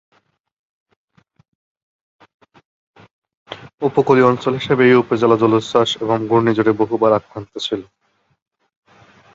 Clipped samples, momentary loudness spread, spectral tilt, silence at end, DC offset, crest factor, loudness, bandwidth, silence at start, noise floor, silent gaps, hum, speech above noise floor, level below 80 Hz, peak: under 0.1%; 14 LU; -6.5 dB/octave; 1.5 s; under 0.1%; 18 dB; -16 LUFS; 7.8 kHz; 3.5 s; -49 dBFS; 3.74-3.78 s; none; 34 dB; -56 dBFS; 0 dBFS